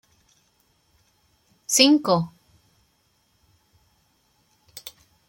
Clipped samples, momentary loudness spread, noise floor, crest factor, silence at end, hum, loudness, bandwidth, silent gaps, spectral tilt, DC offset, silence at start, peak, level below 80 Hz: under 0.1%; 26 LU; -66 dBFS; 28 dB; 0.4 s; none; -19 LUFS; 16.5 kHz; none; -3 dB/octave; under 0.1%; 1.7 s; 0 dBFS; -70 dBFS